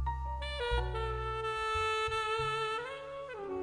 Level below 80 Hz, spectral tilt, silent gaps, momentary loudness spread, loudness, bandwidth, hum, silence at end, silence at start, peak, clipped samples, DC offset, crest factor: -42 dBFS; -4.5 dB/octave; none; 10 LU; -35 LUFS; 11 kHz; none; 0 s; 0 s; -20 dBFS; under 0.1%; under 0.1%; 14 dB